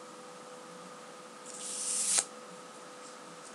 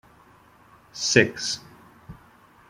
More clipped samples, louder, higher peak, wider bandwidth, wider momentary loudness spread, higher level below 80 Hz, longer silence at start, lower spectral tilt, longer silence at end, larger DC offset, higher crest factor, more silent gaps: neither; second, -31 LUFS vs -22 LUFS; second, -10 dBFS vs -2 dBFS; about the same, 16 kHz vs 16 kHz; first, 20 LU vs 15 LU; second, under -90 dBFS vs -58 dBFS; second, 0 s vs 0.95 s; second, 0.5 dB/octave vs -3 dB/octave; second, 0 s vs 0.55 s; neither; about the same, 30 dB vs 26 dB; neither